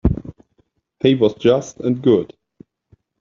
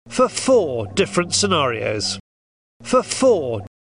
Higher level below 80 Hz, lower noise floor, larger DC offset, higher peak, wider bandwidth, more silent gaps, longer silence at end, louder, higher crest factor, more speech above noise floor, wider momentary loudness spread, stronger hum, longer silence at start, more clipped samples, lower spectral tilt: first, -34 dBFS vs -52 dBFS; second, -63 dBFS vs under -90 dBFS; second, under 0.1% vs 0.2%; about the same, -2 dBFS vs -4 dBFS; second, 7.4 kHz vs 10.5 kHz; second, none vs 2.20-2.80 s; first, 0.95 s vs 0.15 s; about the same, -18 LUFS vs -19 LUFS; about the same, 16 dB vs 16 dB; second, 47 dB vs over 71 dB; first, 14 LU vs 8 LU; neither; about the same, 0.05 s vs 0.05 s; neither; first, -7 dB/octave vs -3.5 dB/octave